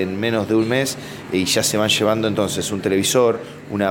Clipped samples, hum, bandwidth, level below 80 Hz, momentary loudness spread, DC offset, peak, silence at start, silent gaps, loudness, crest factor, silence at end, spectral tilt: under 0.1%; none; 17 kHz; -54 dBFS; 8 LU; under 0.1%; -4 dBFS; 0 s; none; -19 LUFS; 16 dB; 0 s; -3.5 dB/octave